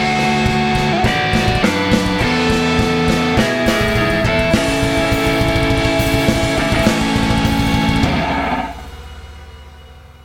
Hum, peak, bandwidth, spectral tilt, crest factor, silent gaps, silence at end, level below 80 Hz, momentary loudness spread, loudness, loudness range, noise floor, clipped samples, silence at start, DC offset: none; 0 dBFS; 16.5 kHz; -5 dB/octave; 16 dB; none; 0.1 s; -28 dBFS; 3 LU; -15 LUFS; 2 LU; -38 dBFS; under 0.1%; 0 s; under 0.1%